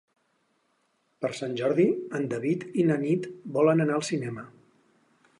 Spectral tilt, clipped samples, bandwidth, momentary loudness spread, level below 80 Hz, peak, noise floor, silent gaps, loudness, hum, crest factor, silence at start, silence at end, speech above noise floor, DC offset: -6.5 dB/octave; under 0.1%; 11.5 kHz; 10 LU; -76 dBFS; -10 dBFS; -72 dBFS; none; -27 LUFS; none; 18 dB; 1.2 s; 0.9 s; 46 dB; under 0.1%